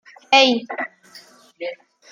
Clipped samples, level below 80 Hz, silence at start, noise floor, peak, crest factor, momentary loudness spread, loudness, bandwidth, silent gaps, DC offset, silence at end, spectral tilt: under 0.1%; -80 dBFS; 0.3 s; -47 dBFS; -2 dBFS; 20 dB; 18 LU; -17 LUFS; 15.5 kHz; none; under 0.1%; 0.35 s; -2 dB/octave